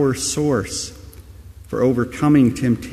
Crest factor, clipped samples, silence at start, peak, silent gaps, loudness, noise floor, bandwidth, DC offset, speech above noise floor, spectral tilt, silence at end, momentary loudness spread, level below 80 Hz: 16 dB; under 0.1%; 0 s; -4 dBFS; none; -19 LUFS; -40 dBFS; 15 kHz; under 0.1%; 22 dB; -5.5 dB/octave; 0 s; 12 LU; -42 dBFS